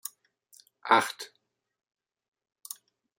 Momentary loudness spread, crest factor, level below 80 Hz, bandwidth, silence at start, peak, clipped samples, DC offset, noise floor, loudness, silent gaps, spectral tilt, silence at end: 20 LU; 28 dB; -84 dBFS; 16.5 kHz; 0.85 s; -6 dBFS; under 0.1%; under 0.1%; -62 dBFS; -26 LUFS; none; -2 dB/octave; 1.9 s